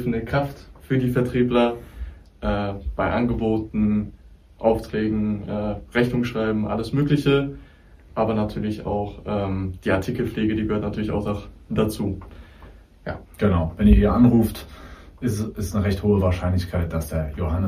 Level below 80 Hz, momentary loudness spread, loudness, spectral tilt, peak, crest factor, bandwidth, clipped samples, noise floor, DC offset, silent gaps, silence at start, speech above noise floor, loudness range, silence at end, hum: -34 dBFS; 13 LU; -23 LUFS; -7.5 dB/octave; -2 dBFS; 20 dB; 15.5 kHz; under 0.1%; -48 dBFS; under 0.1%; none; 0 s; 26 dB; 5 LU; 0 s; none